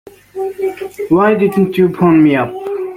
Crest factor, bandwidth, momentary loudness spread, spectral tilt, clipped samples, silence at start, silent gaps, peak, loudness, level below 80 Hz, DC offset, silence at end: 12 dB; 16 kHz; 14 LU; -8.5 dB/octave; under 0.1%; 0.35 s; none; 0 dBFS; -13 LUFS; -50 dBFS; under 0.1%; 0 s